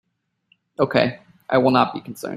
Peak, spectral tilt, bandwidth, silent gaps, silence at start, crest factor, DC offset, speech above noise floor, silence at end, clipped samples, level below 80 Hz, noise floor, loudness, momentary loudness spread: -2 dBFS; -6.5 dB/octave; 13.5 kHz; none; 0.8 s; 20 dB; under 0.1%; 45 dB; 0 s; under 0.1%; -60 dBFS; -64 dBFS; -20 LUFS; 18 LU